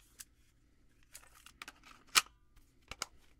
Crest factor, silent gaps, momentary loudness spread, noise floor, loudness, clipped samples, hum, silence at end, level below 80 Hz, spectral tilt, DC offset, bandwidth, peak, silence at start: 34 dB; none; 26 LU; -68 dBFS; -33 LUFS; under 0.1%; none; 0.35 s; -66 dBFS; 1.5 dB/octave; under 0.1%; 17 kHz; -8 dBFS; 1.65 s